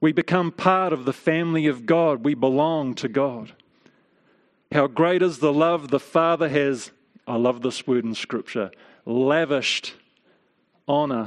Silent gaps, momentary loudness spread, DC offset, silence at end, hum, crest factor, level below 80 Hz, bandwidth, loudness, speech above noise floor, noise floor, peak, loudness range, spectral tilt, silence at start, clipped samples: none; 10 LU; under 0.1%; 0 s; none; 22 dB; -68 dBFS; 11 kHz; -22 LUFS; 44 dB; -65 dBFS; -2 dBFS; 3 LU; -6 dB/octave; 0 s; under 0.1%